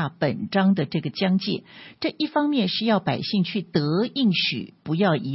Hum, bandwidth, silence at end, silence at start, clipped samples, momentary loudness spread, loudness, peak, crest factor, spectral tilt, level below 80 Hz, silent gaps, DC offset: none; 5.8 kHz; 0 s; 0 s; under 0.1%; 8 LU; -23 LUFS; -8 dBFS; 16 dB; -9.5 dB/octave; -64 dBFS; none; under 0.1%